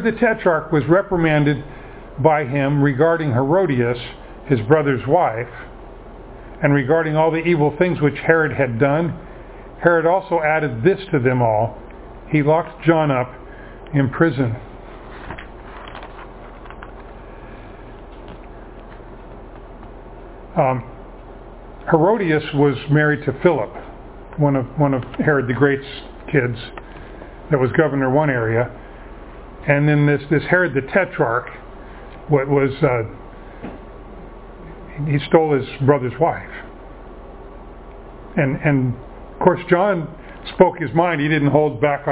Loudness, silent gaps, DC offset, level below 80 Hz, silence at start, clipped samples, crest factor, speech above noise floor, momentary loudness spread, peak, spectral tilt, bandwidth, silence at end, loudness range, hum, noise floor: -18 LUFS; none; under 0.1%; -42 dBFS; 0 s; under 0.1%; 20 dB; 20 dB; 23 LU; 0 dBFS; -11.5 dB/octave; 4 kHz; 0 s; 10 LU; none; -37 dBFS